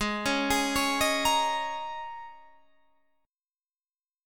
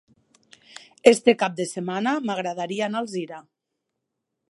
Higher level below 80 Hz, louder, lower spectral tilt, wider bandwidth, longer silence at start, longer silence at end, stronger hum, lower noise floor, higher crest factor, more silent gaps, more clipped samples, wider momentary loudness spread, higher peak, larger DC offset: first, -52 dBFS vs -70 dBFS; second, -27 LUFS vs -23 LUFS; second, -2 dB/octave vs -4.5 dB/octave; first, 19 kHz vs 11.5 kHz; second, 0 s vs 1.05 s; second, 0 s vs 1.1 s; neither; first, under -90 dBFS vs -81 dBFS; second, 18 dB vs 24 dB; first, 3.76-3.80 s vs none; neither; about the same, 16 LU vs 17 LU; second, -12 dBFS vs 0 dBFS; neither